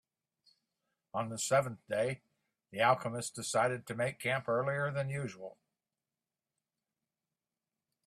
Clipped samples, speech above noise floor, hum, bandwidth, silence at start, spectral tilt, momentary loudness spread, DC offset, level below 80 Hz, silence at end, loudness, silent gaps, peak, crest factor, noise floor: under 0.1%; over 56 dB; none; 15 kHz; 1.15 s; -4 dB/octave; 13 LU; under 0.1%; -74 dBFS; 2.55 s; -34 LUFS; none; -14 dBFS; 22 dB; under -90 dBFS